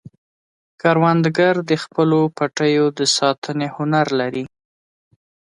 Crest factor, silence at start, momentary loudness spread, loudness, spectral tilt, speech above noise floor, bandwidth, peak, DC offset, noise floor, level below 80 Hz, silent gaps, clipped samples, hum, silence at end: 16 dB; 0.85 s; 8 LU; -18 LUFS; -5 dB/octave; over 73 dB; 11 kHz; -2 dBFS; under 0.1%; under -90 dBFS; -64 dBFS; 3.38-3.42 s; under 0.1%; none; 1.1 s